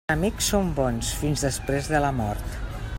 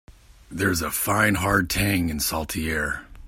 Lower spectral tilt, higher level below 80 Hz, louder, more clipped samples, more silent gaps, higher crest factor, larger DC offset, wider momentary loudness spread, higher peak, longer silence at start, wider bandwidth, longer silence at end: about the same, -4.5 dB/octave vs -4 dB/octave; first, -34 dBFS vs -40 dBFS; about the same, -25 LUFS vs -23 LUFS; neither; neither; about the same, 18 dB vs 20 dB; neither; about the same, 8 LU vs 6 LU; second, -8 dBFS vs -4 dBFS; about the same, 0.1 s vs 0.1 s; about the same, 16.5 kHz vs 16.5 kHz; about the same, 0 s vs 0 s